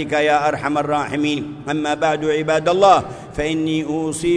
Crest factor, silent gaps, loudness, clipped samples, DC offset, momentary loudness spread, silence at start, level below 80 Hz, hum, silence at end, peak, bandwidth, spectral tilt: 18 dB; none; -18 LUFS; under 0.1%; under 0.1%; 9 LU; 0 s; -46 dBFS; none; 0 s; 0 dBFS; 11 kHz; -5 dB/octave